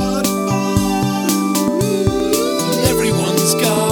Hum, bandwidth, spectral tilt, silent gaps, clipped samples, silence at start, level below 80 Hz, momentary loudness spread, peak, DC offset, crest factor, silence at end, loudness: none; over 20 kHz; -4.5 dB/octave; none; under 0.1%; 0 s; -38 dBFS; 3 LU; 0 dBFS; under 0.1%; 16 dB; 0 s; -16 LUFS